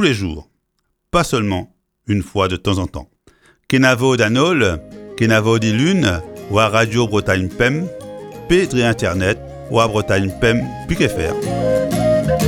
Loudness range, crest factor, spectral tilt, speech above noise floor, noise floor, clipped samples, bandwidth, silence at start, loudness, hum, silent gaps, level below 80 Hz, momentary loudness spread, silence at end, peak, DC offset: 3 LU; 16 dB; -5.5 dB/octave; 53 dB; -69 dBFS; under 0.1%; 17.5 kHz; 0 s; -17 LUFS; none; none; -36 dBFS; 11 LU; 0 s; 0 dBFS; under 0.1%